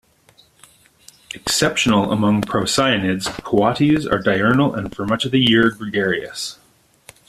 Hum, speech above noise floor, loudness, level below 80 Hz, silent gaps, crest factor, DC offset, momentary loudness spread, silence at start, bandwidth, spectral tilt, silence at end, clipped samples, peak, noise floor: none; 36 dB; -18 LUFS; -48 dBFS; none; 16 dB; under 0.1%; 9 LU; 1.35 s; 14.5 kHz; -4.5 dB/octave; 0.75 s; under 0.1%; -2 dBFS; -54 dBFS